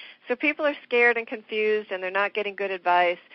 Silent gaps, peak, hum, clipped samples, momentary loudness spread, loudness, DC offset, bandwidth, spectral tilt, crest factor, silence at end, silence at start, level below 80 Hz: none; -8 dBFS; none; under 0.1%; 9 LU; -24 LUFS; under 0.1%; 6 kHz; -0.5 dB/octave; 16 dB; 0.15 s; 0 s; -74 dBFS